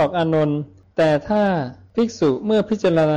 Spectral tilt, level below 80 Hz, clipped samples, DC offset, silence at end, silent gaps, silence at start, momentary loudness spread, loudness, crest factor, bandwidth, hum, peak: -7 dB/octave; -52 dBFS; under 0.1%; under 0.1%; 0 s; none; 0 s; 8 LU; -20 LUFS; 8 dB; 9.2 kHz; none; -10 dBFS